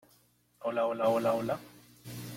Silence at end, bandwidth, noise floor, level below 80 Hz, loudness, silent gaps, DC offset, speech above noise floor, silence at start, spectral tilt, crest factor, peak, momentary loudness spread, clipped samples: 0 s; 16.5 kHz; -67 dBFS; -70 dBFS; -31 LUFS; none; under 0.1%; 37 dB; 0.6 s; -6 dB/octave; 16 dB; -16 dBFS; 17 LU; under 0.1%